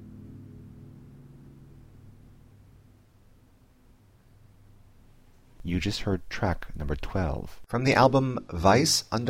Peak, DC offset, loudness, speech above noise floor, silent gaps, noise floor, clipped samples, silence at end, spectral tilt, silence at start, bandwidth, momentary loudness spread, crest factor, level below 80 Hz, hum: -8 dBFS; under 0.1%; -26 LUFS; 33 dB; none; -58 dBFS; under 0.1%; 0 s; -4.5 dB/octave; 0 s; 16.5 kHz; 27 LU; 22 dB; -44 dBFS; none